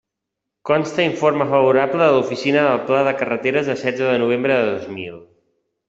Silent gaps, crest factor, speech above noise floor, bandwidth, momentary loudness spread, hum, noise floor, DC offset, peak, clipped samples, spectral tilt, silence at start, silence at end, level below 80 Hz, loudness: none; 16 dB; 64 dB; 7.8 kHz; 8 LU; none; -81 dBFS; under 0.1%; -2 dBFS; under 0.1%; -6 dB/octave; 0.65 s; 0.65 s; -60 dBFS; -18 LUFS